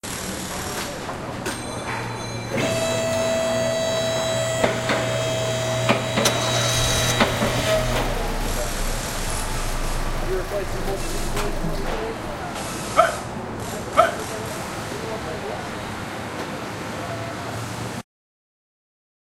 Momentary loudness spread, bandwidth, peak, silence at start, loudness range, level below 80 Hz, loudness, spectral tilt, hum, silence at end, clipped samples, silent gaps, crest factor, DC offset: 10 LU; 16 kHz; 0 dBFS; 0.05 s; 9 LU; -32 dBFS; -24 LUFS; -3.5 dB/octave; none; 1.35 s; under 0.1%; none; 24 dB; under 0.1%